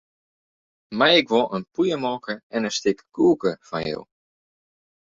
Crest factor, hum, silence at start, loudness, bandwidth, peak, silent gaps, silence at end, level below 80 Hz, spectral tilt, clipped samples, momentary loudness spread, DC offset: 20 dB; none; 0.9 s; -22 LUFS; 7.8 kHz; -4 dBFS; 2.43-2.50 s; 1.1 s; -62 dBFS; -4 dB/octave; under 0.1%; 13 LU; under 0.1%